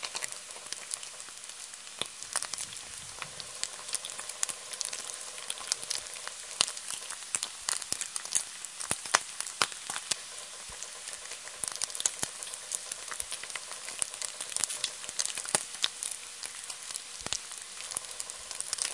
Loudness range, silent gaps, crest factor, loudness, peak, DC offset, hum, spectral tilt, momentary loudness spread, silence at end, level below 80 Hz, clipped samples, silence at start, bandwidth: 4 LU; none; 36 dB; -34 LUFS; 0 dBFS; under 0.1%; none; 1 dB/octave; 10 LU; 0 s; -70 dBFS; under 0.1%; 0 s; 11.5 kHz